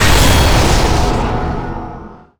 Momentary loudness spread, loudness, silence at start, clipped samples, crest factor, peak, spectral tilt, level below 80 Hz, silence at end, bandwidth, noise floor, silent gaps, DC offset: 17 LU; -13 LUFS; 0 s; under 0.1%; 10 dB; -4 dBFS; -4.5 dB/octave; -16 dBFS; 0.1 s; over 20 kHz; -32 dBFS; none; under 0.1%